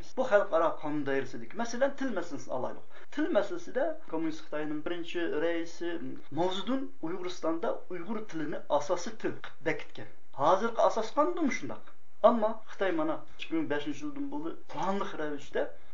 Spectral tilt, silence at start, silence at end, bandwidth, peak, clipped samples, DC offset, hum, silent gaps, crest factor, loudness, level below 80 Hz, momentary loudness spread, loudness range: -5 dB/octave; 0 s; 0.2 s; 7.6 kHz; -8 dBFS; under 0.1%; 3%; none; none; 24 dB; -33 LUFS; -72 dBFS; 12 LU; 5 LU